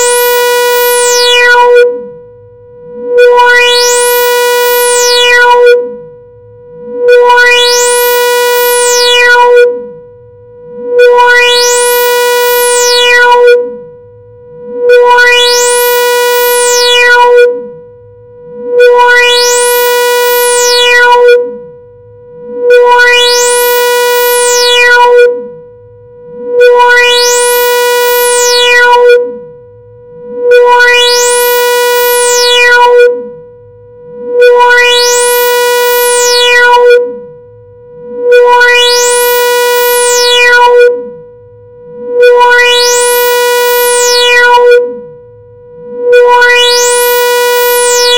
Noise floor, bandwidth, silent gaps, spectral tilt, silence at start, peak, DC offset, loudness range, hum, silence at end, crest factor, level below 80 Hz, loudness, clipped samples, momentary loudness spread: -33 dBFS; over 20 kHz; none; 1.5 dB/octave; 0 s; 0 dBFS; 1%; 2 LU; none; 0 s; 6 dB; -46 dBFS; -4 LUFS; 6%; 9 LU